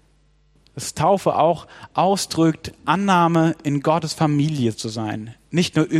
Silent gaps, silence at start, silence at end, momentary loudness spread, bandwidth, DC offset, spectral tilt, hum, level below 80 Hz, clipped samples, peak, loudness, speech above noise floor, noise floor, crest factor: none; 0.75 s; 0 s; 11 LU; 13.5 kHz; under 0.1%; -5.5 dB/octave; none; -56 dBFS; under 0.1%; -2 dBFS; -20 LUFS; 38 dB; -58 dBFS; 18 dB